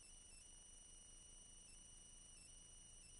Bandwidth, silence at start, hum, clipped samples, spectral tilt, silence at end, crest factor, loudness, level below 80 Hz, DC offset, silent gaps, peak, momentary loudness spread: 11.5 kHz; 0 s; 60 Hz at -80 dBFS; under 0.1%; -1 dB/octave; 0 s; 12 dB; -61 LUFS; -68 dBFS; under 0.1%; none; -50 dBFS; 0 LU